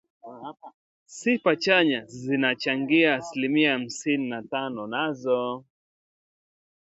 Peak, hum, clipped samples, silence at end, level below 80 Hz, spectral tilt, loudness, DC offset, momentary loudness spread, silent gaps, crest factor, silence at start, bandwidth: -6 dBFS; none; under 0.1%; 1.2 s; -72 dBFS; -4.5 dB/octave; -24 LUFS; under 0.1%; 17 LU; 0.74-1.06 s; 20 dB; 0.25 s; 8.2 kHz